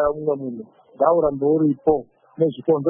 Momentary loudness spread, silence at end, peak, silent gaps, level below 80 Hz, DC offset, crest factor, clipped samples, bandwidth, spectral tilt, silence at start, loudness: 9 LU; 0 s; -4 dBFS; none; -52 dBFS; under 0.1%; 16 dB; under 0.1%; 3.6 kHz; -13 dB/octave; 0 s; -21 LUFS